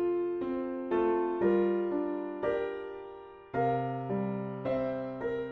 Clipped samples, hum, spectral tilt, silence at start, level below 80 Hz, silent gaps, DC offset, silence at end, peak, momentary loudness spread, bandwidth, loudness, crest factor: under 0.1%; none; -10 dB/octave; 0 s; -62 dBFS; none; under 0.1%; 0 s; -16 dBFS; 10 LU; 4.6 kHz; -32 LUFS; 16 dB